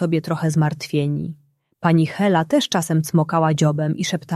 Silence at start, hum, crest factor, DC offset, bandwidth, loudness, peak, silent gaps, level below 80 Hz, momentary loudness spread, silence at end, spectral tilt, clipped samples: 0 s; none; 16 dB; under 0.1%; 13 kHz; -20 LUFS; -2 dBFS; none; -58 dBFS; 6 LU; 0 s; -6 dB/octave; under 0.1%